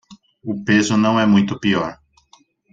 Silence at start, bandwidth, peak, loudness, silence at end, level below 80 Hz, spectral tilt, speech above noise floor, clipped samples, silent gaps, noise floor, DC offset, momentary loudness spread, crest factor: 0.1 s; 7.8 kHz; -4 dBFS; -17 LUFS; 0.8 s; -56 dBFS; -5.5 dB/octave; 38 dB; under 0.1%; none; -55 dBFS; under 0.1%; 14 LU; 16 dB